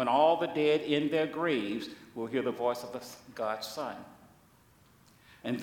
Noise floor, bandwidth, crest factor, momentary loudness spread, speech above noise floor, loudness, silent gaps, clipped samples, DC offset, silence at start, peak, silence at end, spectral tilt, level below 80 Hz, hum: -62 dBFS; 18.5 kHz; 18 dB; 16 LU; 31 dB; -31 LUFS; none; under 0.1%; under 0.1%; 0 s; -14 dBFS; 0 s; -5 dB/octave; -72 dBFS; none